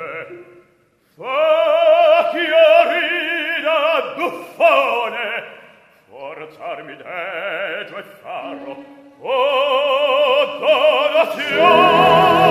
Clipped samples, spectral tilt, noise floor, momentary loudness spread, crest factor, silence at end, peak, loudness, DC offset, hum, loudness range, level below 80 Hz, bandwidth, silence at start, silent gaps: under 0.1%; -4.5 dB/octave; -58 dBFS; 21 LU; 16 dB; 0 s; 0 dBFS; -15 LUFS; under 0.1%; none; 14 LU; -58 dBFS; 14.5 kHz; 0 s; none